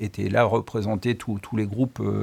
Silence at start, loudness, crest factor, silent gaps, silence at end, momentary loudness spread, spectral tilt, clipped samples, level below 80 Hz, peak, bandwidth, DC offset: 0 s; -25 LUFS; 18 dB; none; 0 s; 7 LU; -7.5 dB/octave; under 0.1%; -56 dBFS; -6 dBFS; 15 kHz; under 0.1%